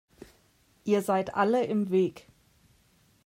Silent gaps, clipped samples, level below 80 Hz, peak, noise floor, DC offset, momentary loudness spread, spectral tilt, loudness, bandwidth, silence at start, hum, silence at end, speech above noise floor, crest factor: none; under 0.1%; -68 dBFS; -12 dBFS; -65 dBFS; under 0.1%; 5 LU; -6.5 dB/octave; -27 LUFS; 16 kHz; 0.2 s; none; 1.05 s; 39 dB; 18 dB